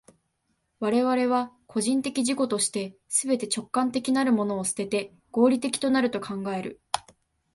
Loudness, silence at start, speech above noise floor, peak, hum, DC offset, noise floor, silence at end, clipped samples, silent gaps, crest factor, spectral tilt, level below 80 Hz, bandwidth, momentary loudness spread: -26 LUFS; 0.8 s; 49 dB; -4 dBFS; none; under 0.1%; -75 dBFS; 0.55 s; under 0.1%; none; 22 dB; -3.5 dB/octave; -68 dBFS; 12 kHz; 9 LU